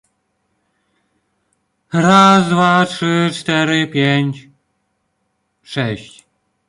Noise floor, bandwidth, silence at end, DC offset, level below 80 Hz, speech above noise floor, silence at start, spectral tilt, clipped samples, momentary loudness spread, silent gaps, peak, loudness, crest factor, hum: -68 dBFS; 11.5 kHz; 0.65 s; under 0.1%; -58 dBFS; 55 dB; 1.95 s; -5.5 dB/octave; under 0.1%; 14 LU; none; 0 dBFS; -14 LUFS; 16 dB; none